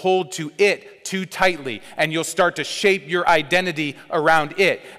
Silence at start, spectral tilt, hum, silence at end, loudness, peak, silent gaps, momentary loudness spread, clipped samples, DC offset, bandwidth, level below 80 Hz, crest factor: 0 s; -3.5 dB/octave; none; 0 s; -20 LUFS; -6 dBFS; none; 10 LU; under 0.1%; under 0.1%; 16 kHz; -56 dBFS; 14 dB